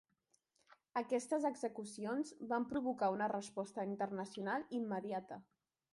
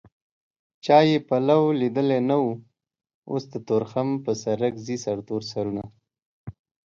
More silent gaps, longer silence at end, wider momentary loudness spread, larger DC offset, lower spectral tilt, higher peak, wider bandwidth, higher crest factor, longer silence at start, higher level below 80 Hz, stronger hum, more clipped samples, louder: second, none vs 3.14-3.22 s, 6.22-6.44 s; first, 0.5 s vs 0.35 s; second, 8 LU vs 18 LU; neither; about the same, -5.5 dB/octave vs -6.5 dB/octave; second, -24 dBFS vs -4 dBFS; first, 11.5 kHz vs 7.6 kHz; about the same, 16 dB vs 20 dB; second, 0.7 s vs 0.85 s; second, -82 dBFS vs -62 dBFS; neither; neither; second, -41 LUFS vs -24 LUFS